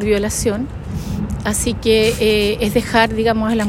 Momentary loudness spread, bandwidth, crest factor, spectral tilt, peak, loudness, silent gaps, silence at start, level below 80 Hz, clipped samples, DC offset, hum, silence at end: 10 LU; 16.5 kHz; 16 dB; -4.5 dB/octave; 0 dBFS; -17 LUFS; none; 0 s; -30 dBFS; under 0.1%; under 0.1%; none; 0 s